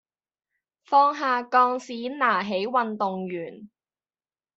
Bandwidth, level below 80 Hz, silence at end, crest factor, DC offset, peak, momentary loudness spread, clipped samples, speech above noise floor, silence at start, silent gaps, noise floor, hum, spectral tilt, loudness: 8 kHz; -76 dBFS; 0.9 s; 18 dB; under 0.1%; -6 dBFS; 13 LU; under 0.1%; over 66 dB; 0.9 s; none; under -90 dBFS; none; -2.5 dB/octave; -24 LUFS